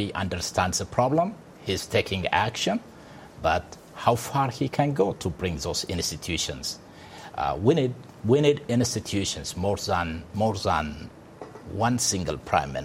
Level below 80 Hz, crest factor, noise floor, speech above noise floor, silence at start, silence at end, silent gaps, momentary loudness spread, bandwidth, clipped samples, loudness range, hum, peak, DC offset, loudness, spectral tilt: -48 dBFS; 22 dB; -46 dBFS; 20 dB; 0 s; 0 s; none; 15 LU; 16 kHz; under 0.1%; 3 LU; none; -6 dBFS; under 0.1%; -26 LUFS; -4.5 dB/octave